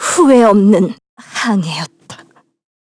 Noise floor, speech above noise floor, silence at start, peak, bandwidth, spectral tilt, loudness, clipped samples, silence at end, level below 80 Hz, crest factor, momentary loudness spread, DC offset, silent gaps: -45 dBFS; 34 dB; 0 s; 0 dBFS; 11 kHz; -5 dB/octave; -12 LUFS; under 0.1%; 0.7 s; -56 dBFS; 12 dB; 18 LU; under 0.1%; 1.09-1.17 s